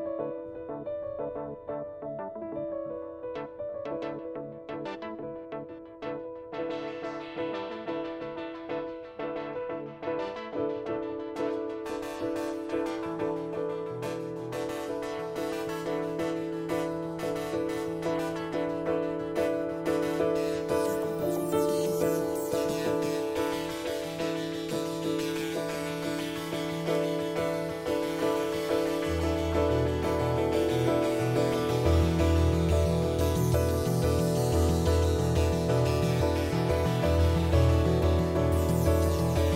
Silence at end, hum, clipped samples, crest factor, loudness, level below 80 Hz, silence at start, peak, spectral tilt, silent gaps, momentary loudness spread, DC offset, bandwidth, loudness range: 0 s; none; under 0.1%; 16 dB; -30 LUFS; -40 dBFS; 0 s; -12 dBFS; -6.5 dB/octave; none; 12 LU; under 0.1%; 16 kHz; 11 LU